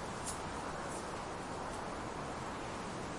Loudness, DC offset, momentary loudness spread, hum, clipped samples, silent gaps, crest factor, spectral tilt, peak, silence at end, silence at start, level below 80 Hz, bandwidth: -42 LUFS; under 0.1%; 2 LU; none; under 0.1%; none; 16 dB; -4 dB/octave; -26 dBFS; 0 s; 0 s; -56 dBFS; 11.5 kHz